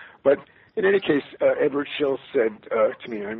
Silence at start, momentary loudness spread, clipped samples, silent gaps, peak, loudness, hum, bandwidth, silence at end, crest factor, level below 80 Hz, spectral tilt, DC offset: 0 s; 5 LU; under 0.1%; none; -6 dBFS; -23 LUFS; none; 4.3 kHz; 0 s; 16 dB; -66 dBFS; -3.5 dB/octave; under 0.1%